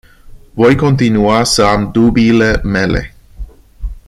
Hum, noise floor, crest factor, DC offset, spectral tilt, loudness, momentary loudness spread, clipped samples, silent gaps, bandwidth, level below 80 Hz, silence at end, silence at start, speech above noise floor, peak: none; -36 dBFS; 12 dB; under 0.1%; -5.5 dB/octave; -11 LUFS; 20 LU; under 0.1%; none; 13.5 kHz; -26 dBFS; 0.1 s; 0.25 s; 26 dB; 0 dBFS